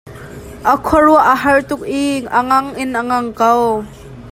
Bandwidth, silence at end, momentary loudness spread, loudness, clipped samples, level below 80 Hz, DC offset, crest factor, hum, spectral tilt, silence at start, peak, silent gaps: 16 kHz; 0 s; 15 LU; -14 LUFS; under 0.1%; -40 dBFS; under 0.1%; 14 dB; none; -5 dB/octave; 0.05 s; 0 dBFS; none